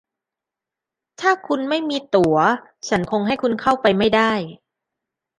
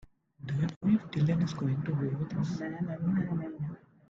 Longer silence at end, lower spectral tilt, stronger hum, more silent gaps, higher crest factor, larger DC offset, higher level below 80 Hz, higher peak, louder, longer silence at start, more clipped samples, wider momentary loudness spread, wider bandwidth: first, 0.85 s vs 0.3 s; second, -5 dB/octave vs -8.5 dB/octave; neither; second, none vs 0.76-0.81 s; about the same, 18 dB vs 16 dB; neither; first, -54 dBFS vs -62 dBFS; first, -2 dBFS vs -16 dBFS; first, -19 LUFS vs -32 LUFS; first, 1.2 s vs 0.4 s; neither; about the same, 7 LU vs 9 LU; first, 11 kHz vs 7.4 kHz